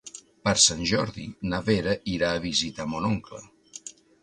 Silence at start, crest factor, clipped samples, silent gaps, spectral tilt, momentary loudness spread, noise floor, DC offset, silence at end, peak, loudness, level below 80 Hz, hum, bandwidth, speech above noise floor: 0.05 s; 22 dB; under 0.1%; none; -3 dB/octave; 24 LU; -45 dBFS; under 0.1%; 0.3 s; -4 dBFS; -25 LUFS; -50 dBFS; none; 11.5 kHz; 19 dB